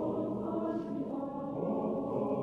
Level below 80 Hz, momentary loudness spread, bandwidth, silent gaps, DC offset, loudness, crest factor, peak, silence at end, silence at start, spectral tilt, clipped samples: -64 dBFS; 4 LU; 6.6 kHz; none; under 0.1%; -36 LUFS; 12 dB; -22 dBFS; 0 s; 0 s; -10.5 dB/octave; under 0.1%